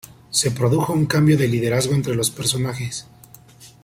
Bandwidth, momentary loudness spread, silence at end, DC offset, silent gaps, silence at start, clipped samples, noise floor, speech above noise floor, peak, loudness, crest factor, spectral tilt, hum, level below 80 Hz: 16.5 kHz; 9 LU; 0.15 s; under 0.1%; none; 0.3 s; under 0.1%; -46 dBFS; 27 dB; -4 dBFS; -20 LUFS; 18 dB; -5 dB/octave; none; -52 dBFS